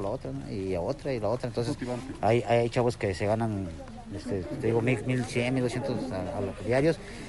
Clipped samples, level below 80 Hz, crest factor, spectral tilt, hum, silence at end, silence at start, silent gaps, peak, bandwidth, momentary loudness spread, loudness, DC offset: under 0.1%; -48 dBFS; 16 dB; -6.5 dB/octave; none; 0 s; 0 s; none; -12 dBFS; 11.5 kHz; 9 LU; -29 LUFS; under 0.1%